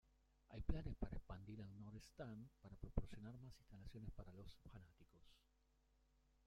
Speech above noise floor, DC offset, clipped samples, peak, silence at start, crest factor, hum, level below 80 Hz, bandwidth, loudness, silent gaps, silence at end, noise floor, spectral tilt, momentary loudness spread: 29 dB; under 0.1%; under 0.1%; -26 dBFS; 0.5 s; 26 dB; none; -58 dBFS; 11.5 kHz; -56 LUFS; none; 1.1 s; -80 dBFS; -7.5 dB/octave; 13 LU